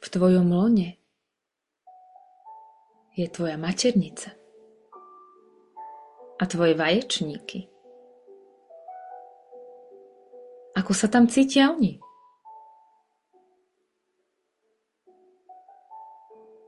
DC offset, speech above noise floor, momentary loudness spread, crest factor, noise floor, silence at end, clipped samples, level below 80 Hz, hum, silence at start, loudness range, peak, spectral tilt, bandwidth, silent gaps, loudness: under 0.1%; 63 dB; 27 LU; 20 dB; -85 dBFS; 0.6 s; under 0.1%; -64 dBFS; none; 0 s; 10 LU; -8 dBFS; -5 dB/octave; 11.5 kHz; none; -23 LUFS